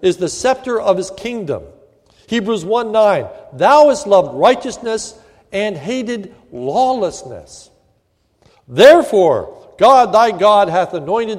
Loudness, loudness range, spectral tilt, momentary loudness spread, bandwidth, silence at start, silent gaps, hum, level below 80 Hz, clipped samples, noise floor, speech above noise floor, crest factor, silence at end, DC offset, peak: -14 LUFS; 9 LU; -4.5 dB/octave; 17 LU; 14.5 kHz; 0 s; none; none; -52 dBFS; 0.2%; -61 dBFS; 48 dB; 14 dB; 0 s; under 0.1%; 0 dBFS